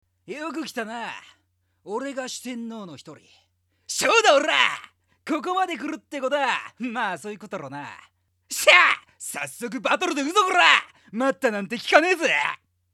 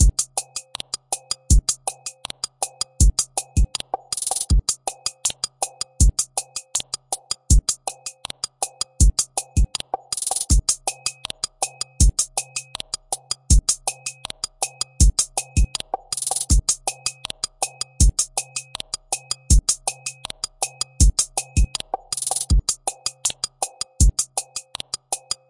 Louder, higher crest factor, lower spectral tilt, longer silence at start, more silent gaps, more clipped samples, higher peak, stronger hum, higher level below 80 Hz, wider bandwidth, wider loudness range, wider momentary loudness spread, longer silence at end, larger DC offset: about the same, -21 LUFS vs -23 LUFS; about the same, 24 dB vs 20 dB; second, -1.5 dB/octave vs -3 dB/octave; first, 0.3 s vs 0 s; neither; neither; about the same, 0 dBFS vs -2 dBFS; neither; second, -76 dBFS vs -24 dBFS; first, 16.5 kHz vs 11.5 kHz; first, 14 LU vs 1 LU; first, 19 LU vs 12 LU; first, 0.4 s vs 0.15 s; neither